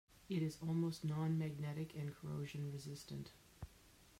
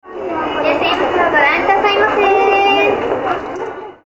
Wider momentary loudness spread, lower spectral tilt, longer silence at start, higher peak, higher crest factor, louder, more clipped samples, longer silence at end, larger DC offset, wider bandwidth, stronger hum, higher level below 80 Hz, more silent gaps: first, 17 LU vs 11 LU; first, -7 dB/octave vs -4.5 dB/octave; first, 0.2 s vs 0.05 s; second, -30 dBFS vs 0 dBFS; about the same, 14 dB vs 14 dB; second, -44 LUFS vs -13 LUFS; neither; about the same, 0 s vs 0.1 s; neither; second, 16 kHz vs over 20 kHz; neither; second, -70 dBFS vs -46 dBFS; neither